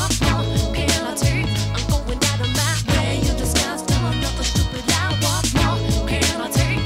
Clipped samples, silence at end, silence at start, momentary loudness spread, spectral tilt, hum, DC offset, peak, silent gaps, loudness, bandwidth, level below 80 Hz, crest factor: under 0.1%; 0 s; 0 s; 3 LU; -4 dB/octave; none; under 0.1%; -2 dBFS; none; -20 LUFS; 16 kHz; -26 dBFS; 18 dB